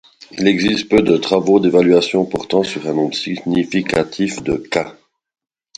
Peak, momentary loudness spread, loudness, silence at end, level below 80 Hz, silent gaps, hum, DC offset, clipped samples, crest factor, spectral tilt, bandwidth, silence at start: 0 dBFS; 9 LU; -16 LUFS; 0.85 s; -48 dBFS; none; none; under 0.1%; under 0.1%; 16 dB; -5.5 dB/octave; 11 kHz; 0.35 s